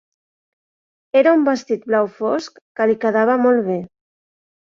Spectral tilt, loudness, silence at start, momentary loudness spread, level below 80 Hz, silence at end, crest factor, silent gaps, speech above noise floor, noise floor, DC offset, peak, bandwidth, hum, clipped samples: -6 dB/octave; -18 LUFS; 1.15 s; 10 LU; -66 dBFS; 0.8 s; 16 dB; 2.61-2.75 s; over 73 dB; under -90 dBFS; under 0.1%; -2 dBFS; 7.6 kHz; none; under 0.1%